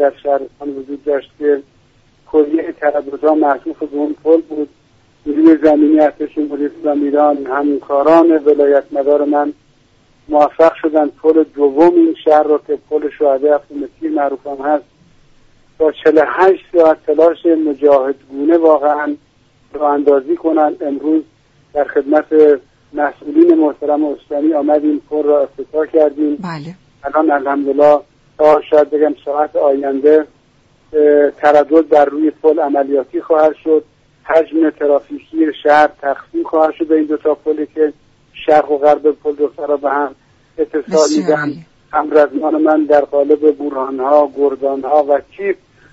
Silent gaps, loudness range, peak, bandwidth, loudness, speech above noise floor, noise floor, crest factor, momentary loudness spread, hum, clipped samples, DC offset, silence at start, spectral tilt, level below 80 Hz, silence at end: none; 4 LU; 0 dBFS; 8 kHz; -13 LUFS; 39 dB; -52 dBFS; 14 dB; 10 LU; none; under 0.1%; under 0.1%; 0 s; -6 dB/octave; -56 dBFS; 0.4 s